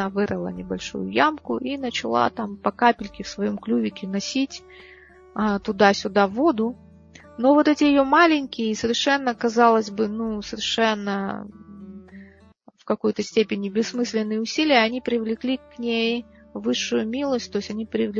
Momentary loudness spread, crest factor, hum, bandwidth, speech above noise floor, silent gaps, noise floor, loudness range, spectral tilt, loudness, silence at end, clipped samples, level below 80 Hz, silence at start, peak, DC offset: 12 LU; 22 dB; none; 7.6 kHz; 31 dB; none; -53 dBFS; 7 LU; -4.5 dB/octave; -22 LUFS; 0 s; under 0.1%; -56 dBFS; 0 s; -2 dBFS; under 0.1%